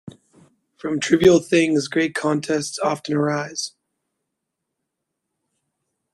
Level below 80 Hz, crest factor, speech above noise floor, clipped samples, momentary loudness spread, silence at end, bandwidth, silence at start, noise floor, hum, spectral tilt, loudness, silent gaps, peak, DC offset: -56 dBFS; 20 dB; 61 dB; under 0.1%; 13 LU; 2.45 s; 12.5 kHz; 0.05 s; -80 dBFS; none; -5 dB/octave; -20 LUFS; none; -2 dBFS; under 0.1%